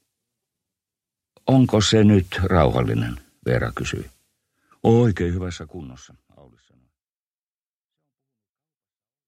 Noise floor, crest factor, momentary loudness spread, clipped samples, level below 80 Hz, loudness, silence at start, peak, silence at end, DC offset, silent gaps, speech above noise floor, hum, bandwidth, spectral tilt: under -90 dBFS; 20 dB; 18 LU; under 0.1%; -42 dBFS; -20 LUFS; 1.45 s; -2 dBFS; 3.3 s; under 0.1%; none; over 71 dB; none; 13.5 kHz; -6.5 dB/octave